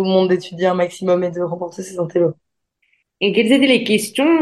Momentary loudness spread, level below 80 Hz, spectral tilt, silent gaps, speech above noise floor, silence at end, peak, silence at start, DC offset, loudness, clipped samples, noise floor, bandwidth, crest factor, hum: 10 LU; -66 dBFS; -5 dB/octave; none; 50 dB; 0 s; -2 dBFS; 0 s; under 0.1%; -17 LUFS; under 0.1%; -66 dBFS; 12.5 kHz; 16 dB; none